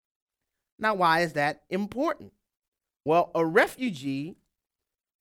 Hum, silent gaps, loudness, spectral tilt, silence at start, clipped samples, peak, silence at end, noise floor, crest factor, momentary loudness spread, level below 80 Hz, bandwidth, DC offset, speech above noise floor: none; 2.68-2.72 s; -26 LUFS; -5.5 dB/octave; 0.8 s; under 0.1%; -8 dBFS; 0.9 s; -89 dBFS; 22 dB; 12 LU; -66 dBFS; 17.5 kHz; under 0.1%; 63 dB